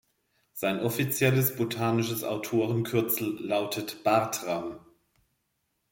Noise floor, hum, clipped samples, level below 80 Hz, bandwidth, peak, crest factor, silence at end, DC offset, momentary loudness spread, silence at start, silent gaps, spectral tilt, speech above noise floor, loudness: -77 dBFS; none; under 0.1%; -66 dBFS; 17 kHz; -10 dBFS; 20 dB; 1.15 s; under 0.1%; 8 LU; 0.55 s; none; -5 dB/octave; 50 dB; -28 LUFS